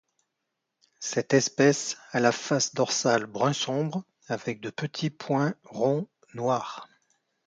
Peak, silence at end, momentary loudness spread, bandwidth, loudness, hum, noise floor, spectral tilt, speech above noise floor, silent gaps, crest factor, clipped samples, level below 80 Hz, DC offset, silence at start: -8 dBFS; 0.6 s; 11 LU; 9.6 kHz; -27 LUFS; none; -82 dBFS; -4 dB/octave; 56 dB; none; 20 dB; under 0.1%; -72 dBFS; under 0.1%; 1 s